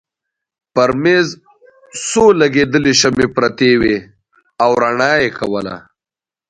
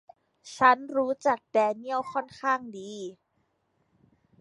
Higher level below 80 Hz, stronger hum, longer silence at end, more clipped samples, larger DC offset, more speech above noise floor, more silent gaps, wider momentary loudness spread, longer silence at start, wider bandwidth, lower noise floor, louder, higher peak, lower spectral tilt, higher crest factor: first, -46 dBFS vs -74 dBFS; neither; second, 0.7 s vs 1.3 s; neither; neither; first, 77 dB vs 47 dB; neither; second, 11 LU vs 18 LU; first, 0.75 s vs 0.45 s; about the same, 10.5 kHz vs 11.5 kHz; first, -90 dBFS vs -74 dBFS; first, -13 LUFS vs -26 LUFS; first, 0 dBFS vs -6 dBFS; about the same, -4 dB/octave vs -4 dB/octave; second, 16 dB vs 24 dB